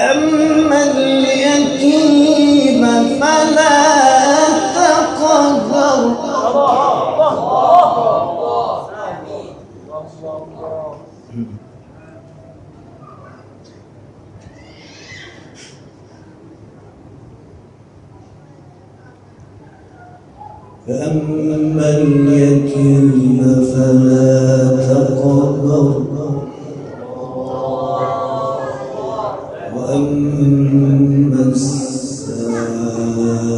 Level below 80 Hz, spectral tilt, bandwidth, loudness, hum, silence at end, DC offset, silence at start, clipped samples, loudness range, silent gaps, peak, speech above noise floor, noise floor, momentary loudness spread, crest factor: -50 dBFS; -6 dB/octave; 10.5 kHz; -13 LUFS; none; 0 s; under 0.1%; 0 s; under 0.1%; 19 LU; none; 0 dBFS; 31 dB; -41 dBFS; 18 LU; 14 dB